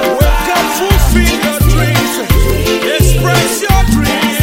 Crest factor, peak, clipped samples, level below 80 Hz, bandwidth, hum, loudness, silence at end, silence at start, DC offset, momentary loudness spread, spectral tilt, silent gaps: 10 dB; 0 dBFS; 0.3%; -14 dBFS; 17 kHz; none; -11 LUFS; 0 s; 0 s; under 0.1%; 2 LU; -4.5 dB/octave; none